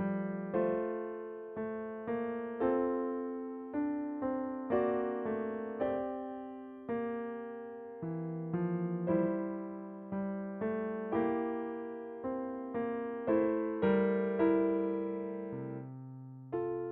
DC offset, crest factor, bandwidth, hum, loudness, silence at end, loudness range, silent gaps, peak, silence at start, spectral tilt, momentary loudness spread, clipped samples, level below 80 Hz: under 0.1%; 18 dB; 4.1 kHz; none; -36 LUFS; 0 s; 5 LU; none; -18 dBFS; 0 s; -8 dB/octave; 12 LU; under 0.1%; -70 dBFS